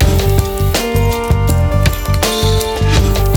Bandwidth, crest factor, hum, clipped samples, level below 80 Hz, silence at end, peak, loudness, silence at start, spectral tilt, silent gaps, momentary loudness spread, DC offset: over 20 kHz; 12 dB; none; under 0.1%; -18 dBFS; 0 s; 0 dBFS; -14 LUFS; 0 s; -5 dB/octave; none; 2 LU; under 0.1%